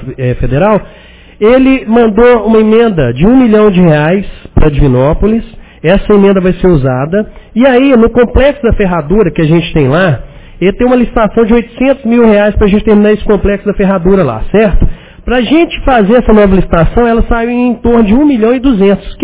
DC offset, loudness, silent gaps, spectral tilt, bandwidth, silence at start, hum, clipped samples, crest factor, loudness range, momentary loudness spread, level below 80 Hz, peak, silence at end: 1%; -8 LUFS; none; -11.5 dB/octave; 4 kHz; 0 s; none; 1%; 8 dB; 2 LU; 6 LU; -20 dBFS; 0 dBFS; 0 s